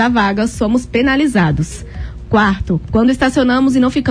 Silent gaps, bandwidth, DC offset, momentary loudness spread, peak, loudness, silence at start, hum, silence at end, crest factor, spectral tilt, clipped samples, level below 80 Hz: none; 11 kHz; under 0.1%; 9 LU; -2 dBFS; -14 LUFS; 0 s; none; 0 s; 12 dB; -6 dB/octave; under 0.1%; -30 dBFS